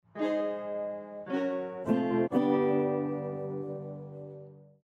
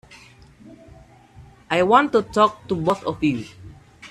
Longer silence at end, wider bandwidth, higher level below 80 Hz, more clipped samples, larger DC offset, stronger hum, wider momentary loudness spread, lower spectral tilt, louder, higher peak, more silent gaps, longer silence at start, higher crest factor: first, 0.2 s vs 0.05 s; second, 7.6 kHz vs 13 kHz; second, -74 dBFS vs -52 dBFS; neither; neither; neither; first, 16 LU vs 8 LU; first, -9 dB/octave vs -6 dB/octave; second, -31 LUFS vs -20 LUFS; second, -14 dBFS vs -2 dBFS; neither; second, 0.15 s vs 0.7 s; about the same, 18 dB vs 20 dB